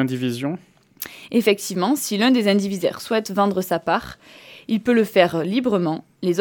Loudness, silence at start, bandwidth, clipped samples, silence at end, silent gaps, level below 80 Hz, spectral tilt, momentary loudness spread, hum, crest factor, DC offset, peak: -21 LUFS; 0 s; 19 kHz; under 0.1%; 0 s; none; -60 dBFS; -5 dB/octave; 13 LU; none; 20 dB; under 0.1%; 0 dBFS